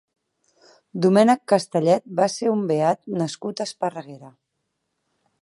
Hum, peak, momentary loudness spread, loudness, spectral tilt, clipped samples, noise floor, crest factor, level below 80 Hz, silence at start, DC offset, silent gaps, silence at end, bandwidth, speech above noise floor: none; -4 dBFS; 12 LU; -21 LUFS; -6 dB/octave; under 0.1%; -77 dBFS; 20 dB; -74 dBFS; 0.95 s; under 0.1%; none; 1.15 s; 11.5 kHz; 56 dB